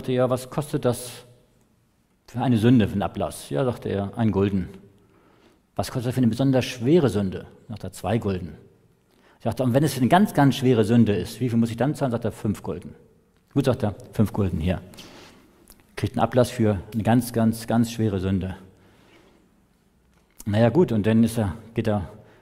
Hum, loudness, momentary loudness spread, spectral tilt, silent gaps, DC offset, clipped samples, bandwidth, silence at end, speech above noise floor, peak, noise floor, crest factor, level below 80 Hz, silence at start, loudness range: none; -23 LUFS; 16 LU; -7 dB/octave; none; under 0.1%; under 0.1%; 16 kHz; 0.25 s; 42 dB; -4 dBFS; -64 dBFS; 20 dB; -50 dBFS; 0 s; 6 LU